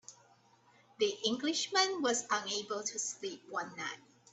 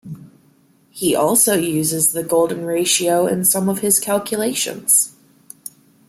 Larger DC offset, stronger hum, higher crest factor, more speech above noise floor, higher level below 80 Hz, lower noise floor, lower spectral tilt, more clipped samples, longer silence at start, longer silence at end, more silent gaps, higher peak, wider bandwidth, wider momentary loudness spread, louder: neither; neither; about the same, 20 dB vs 18 dB; second, 31 dB vs 38 dB; second, -82 dBFS vs -62 dBFS; first, -66 dBFS vs -55 dBFS; second, -1 dB/octave vs -3 dB/octave; neither; about the same, 0.1 s vs 0.05 s; about the same, 0.35 s vs 0.4 s; neither; second, -16 dBFS vs -2 dBFS; second, 8.6 kHz vs 16.5 kHz; second, 12 LU vs 21 LU; second, -34 LUFS vs -16 LUFS